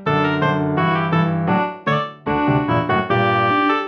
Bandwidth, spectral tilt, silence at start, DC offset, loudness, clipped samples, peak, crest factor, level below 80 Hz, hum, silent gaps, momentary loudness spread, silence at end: 6.4 kHz; -8 dB/octave; 0 s; under 0.1%; -18 LUFS; under 0.1%; -6 dBFS; 12 dB; -50 dBFS; none; none; 5 LU; 0 s